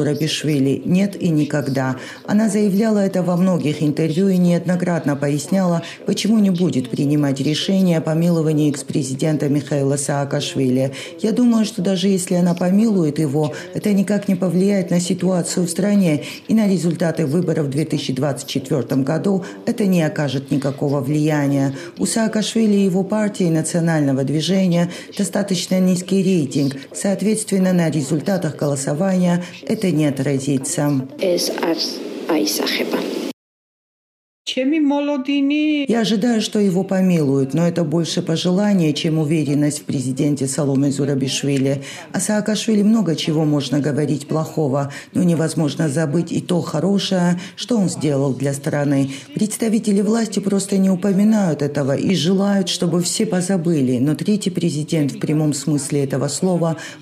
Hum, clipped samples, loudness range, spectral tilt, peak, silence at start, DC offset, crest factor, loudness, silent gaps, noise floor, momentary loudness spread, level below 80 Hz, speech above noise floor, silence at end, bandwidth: none; under 0.1%; 2 LU; -6 dB/octave; -6 dBFS; 0 s; under 0.1%; 12 dB; -18 LUFS; 33.33-34.45 s; under -90 dBFS; 5 LU; -64 dBFS; over 72 dB; 0 s; 15 kHz